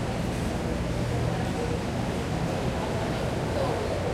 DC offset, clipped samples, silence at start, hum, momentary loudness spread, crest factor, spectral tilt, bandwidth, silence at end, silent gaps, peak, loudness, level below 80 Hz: under 0.1%; under 0.1%; 0 s; none; 2 LU; 14 dB; -6 dB/octave; 15.5 kHz; 0 s; none; -14 dBFS; -29 LUFS; -38 dBFS